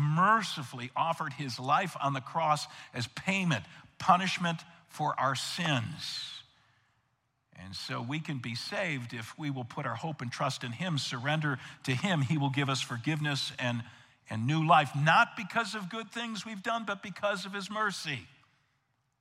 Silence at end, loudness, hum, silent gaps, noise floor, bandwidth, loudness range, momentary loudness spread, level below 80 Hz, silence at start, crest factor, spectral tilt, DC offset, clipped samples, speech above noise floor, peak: 0.95 s; -31 LUFS; none; none; -77 dBFS; 14.5 kHz; 8 LU; 13 LU; -76 dBFS; 0 s; 24 dB; -5 dB/octave; under 0.1%; under 0.1%; 45 dB; -8 dBFS